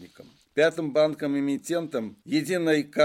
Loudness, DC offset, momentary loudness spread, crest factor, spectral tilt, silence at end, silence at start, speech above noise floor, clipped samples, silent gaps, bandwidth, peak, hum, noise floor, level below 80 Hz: -26 LUFS; under 0.1%; 7 LU; 16 dB; -5 dB/octave; 0 s; 0 s; 28 dB; under 0.1%; none; 16.5 kHz; -10 dBFS; none; -52 dBFS; -72 dBFS